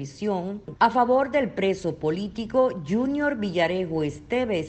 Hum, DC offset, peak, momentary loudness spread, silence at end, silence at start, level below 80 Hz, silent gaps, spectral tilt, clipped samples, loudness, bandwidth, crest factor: none; under 0.1%; -8 dBFS; 7 LU; 0 s; 0 s; -54 dBFS; none; -6.5 dB/octave; under 0.1%; -25 LUFS; 8.6 kHz; 18 dB